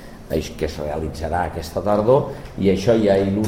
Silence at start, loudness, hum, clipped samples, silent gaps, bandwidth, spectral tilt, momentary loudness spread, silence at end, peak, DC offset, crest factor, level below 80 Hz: 0 s; -21 LUFS; none; under 0.1%; none; 16 kHz; -7 dB/octave; 10 LU; 0 s; -4 dBFS; 0.3%; 16 dB; -36 dBFS